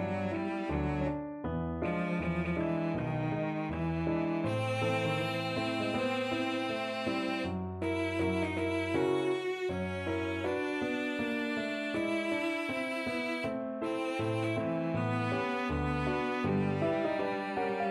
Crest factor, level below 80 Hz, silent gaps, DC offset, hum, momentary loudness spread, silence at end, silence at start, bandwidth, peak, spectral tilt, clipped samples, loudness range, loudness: 14 dB; -52 dBFS; none; under 0.1%; none; 4 LU; 0 s; 0 s; 13.5 kHz; -18 dBFS; -6.5 dB/octave; under 0.1%; 1 LU; -33 LUFS